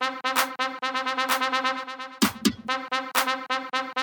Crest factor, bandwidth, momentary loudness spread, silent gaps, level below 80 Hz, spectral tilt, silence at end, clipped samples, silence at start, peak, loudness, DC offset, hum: 20 dB; 19.5 kHz; 5 LU; none; -64 dBFS; -2 dB/octave; 0 s; under 0.1%; 0 s; -6 dBFS; -26 LUFS; under 0.1%; none